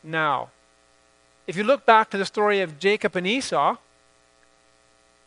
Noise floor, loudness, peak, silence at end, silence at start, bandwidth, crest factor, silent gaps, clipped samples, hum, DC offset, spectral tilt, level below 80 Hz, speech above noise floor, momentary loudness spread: -60 dBFS; -22 LUFS; -2 dBFS; 1.5 s; 0.05 s; 10.5 kHz; 24 dB; none; under 0.1%; 60 Hz at -55 dBFS; under 0.1%; -4 dB/octave; -70 dBFS; 38 dB; 15 LU